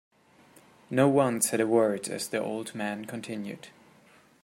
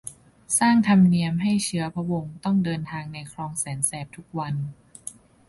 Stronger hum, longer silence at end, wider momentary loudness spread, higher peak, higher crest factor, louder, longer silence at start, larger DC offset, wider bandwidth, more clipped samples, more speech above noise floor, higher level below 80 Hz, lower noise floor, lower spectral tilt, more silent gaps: neither; first, 0.75 s vs 0.35 s; second, 13 LU vs 19 LU; about the same, -8 dBFS vs -8 dBFS; about the same, 20 dB vs 16 dB; second, -28 LUFS vs -23 LUFS; first, 0.9 s vs 0.05 s; neither; first, 16 kHz vs 12 kHz; neither; first, 31 dB vs 20 dB; second, -74 dBFS vs -58 dBFS; first, -59 dBFS vs -44 dBFS; about the same, -4.5 dB/octave vs -5 dB/octave; neither